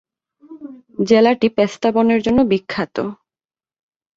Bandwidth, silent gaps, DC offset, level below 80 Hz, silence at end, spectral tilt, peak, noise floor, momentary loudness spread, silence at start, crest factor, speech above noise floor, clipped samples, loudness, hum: 7.6 kHz; none; under 0.1%; -52 dBFS; 1.05 s; -6 dB/octave; -2 dBFS; under -90 dBFS; 21 LU; 0.5 s; 16 dB; over 74 dB; under 0.1%; -16 LUFS; none